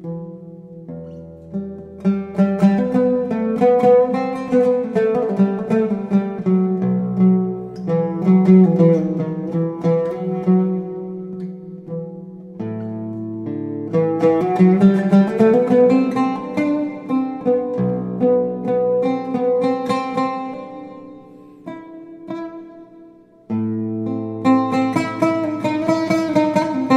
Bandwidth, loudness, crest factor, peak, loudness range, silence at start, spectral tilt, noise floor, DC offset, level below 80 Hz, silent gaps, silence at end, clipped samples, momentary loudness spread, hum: 8.6 kHz; -18 LUFS; 16 dB; -2 dBFS; 10 LU; 0 s; -9 dB/octave; -45 dBFS; under 0.1%; -58 dBFS; none; 0 s; under 0.1%; 19 LU; none